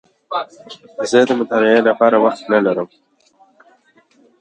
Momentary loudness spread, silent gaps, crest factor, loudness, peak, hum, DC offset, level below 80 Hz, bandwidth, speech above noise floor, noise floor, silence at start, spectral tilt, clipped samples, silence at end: 14 LU; none; 18 dB; -15 LUFS; 0 dBFS; none; under 0.1%; -70 dBFS; 9.2 kHz; 39 dB; -54 dBFS; 0.3 s; -5 dB/octave; under 0.1%; 1.55 s